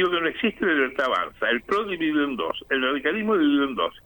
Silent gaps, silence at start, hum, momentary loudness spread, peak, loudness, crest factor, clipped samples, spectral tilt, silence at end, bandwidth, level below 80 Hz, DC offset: none; 0 s; none; 4 LU; -8 dBFS; -23 LUFS; 14 dB; under 0.1%; -5.5 dB/octave; 0.05 s; 19 kHz; -56 dBFS; under 0.1%